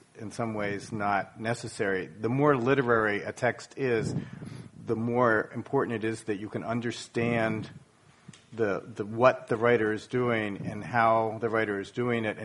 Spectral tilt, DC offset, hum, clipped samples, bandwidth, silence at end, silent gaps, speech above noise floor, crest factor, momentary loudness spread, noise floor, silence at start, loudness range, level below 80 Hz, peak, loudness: -6.5 dB/octave; under 0.1%; none; under 0.1%; 11.5 kHz; 0 s; none; 26 dB; 22 dB; 10 LU; -54 dBFS; 0.15 s; 4 LU; -64 dBFS; -6 dBFS; -28 LUFS